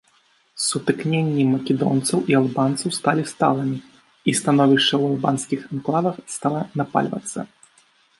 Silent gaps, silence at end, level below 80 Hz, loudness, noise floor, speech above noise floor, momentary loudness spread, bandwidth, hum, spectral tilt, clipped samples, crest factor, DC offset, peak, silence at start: none; 0.75 s; -64 dBFS; -21 LUFS; -60 dBFS; 40 dB; 10 LU; 11.5 kHz; none; -5 dB/octave; under 0.1%; 18 dB; under 0.1%; -2 dBFS; 0.55 s